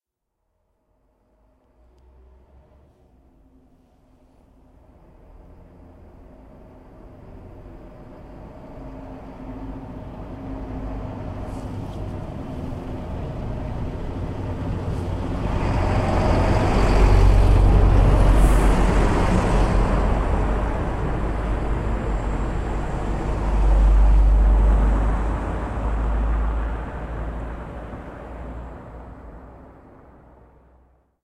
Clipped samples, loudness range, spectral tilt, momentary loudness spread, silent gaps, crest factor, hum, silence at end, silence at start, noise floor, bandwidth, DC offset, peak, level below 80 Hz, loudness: under 0.1%; 21 LU; -7.5 dB/octave; 22 LU; none; 18 dB; none; 1.55 s; 6.2 s; -77 dBFS; 11 kHz; under 0.1%; -4 dBFS; -24 dBFS; -23 LUFS